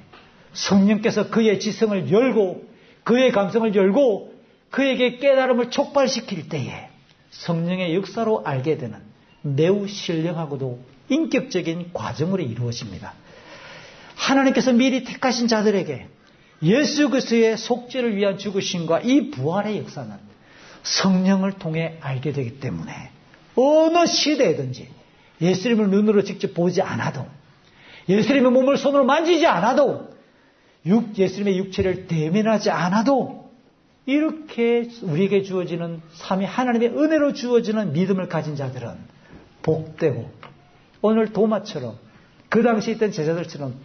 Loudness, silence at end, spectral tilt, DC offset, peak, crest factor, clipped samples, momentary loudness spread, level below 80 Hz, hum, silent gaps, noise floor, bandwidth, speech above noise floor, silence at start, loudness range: -21 LUFS; 0 s; -5.5 dB/octave; under 0.1%; -6 dBFS; 16 dB; under 0.1%; 15 LU; -60 dBFS; none; none; -56 dBFS; 6.6 kHz; 36 dB; 0.15 s; 5 LU